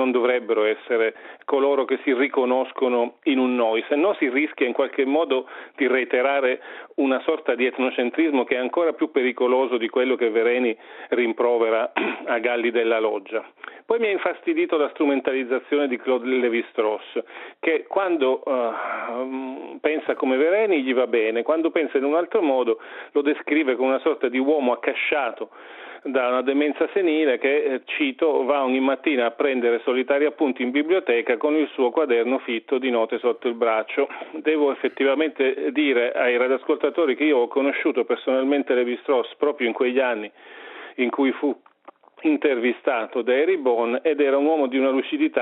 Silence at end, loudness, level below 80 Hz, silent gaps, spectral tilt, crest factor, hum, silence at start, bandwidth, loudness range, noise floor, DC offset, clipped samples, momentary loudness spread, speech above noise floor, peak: 0 s; -22 LUFS; -80 dBFS; none; -1 dB/octave; 16 dB; none; 0 s; 4.1 kHz; 2 LU; -50 dBFS; under 0.1%; under 0.1%; 6 LU; 29 dB; -6 dBFS